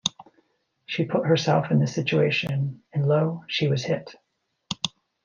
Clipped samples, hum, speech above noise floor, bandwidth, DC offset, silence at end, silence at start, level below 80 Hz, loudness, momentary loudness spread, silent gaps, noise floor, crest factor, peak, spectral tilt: under 0.1%; none; 44 dB; 7.2 kHz; under 0.1%; 0.35 s; 0.05 s; -66 dBFS; -24 LUFS; 9 LU; none; -67 dBFS; 20 dB; -6 dBFS; -5.5 dB/octave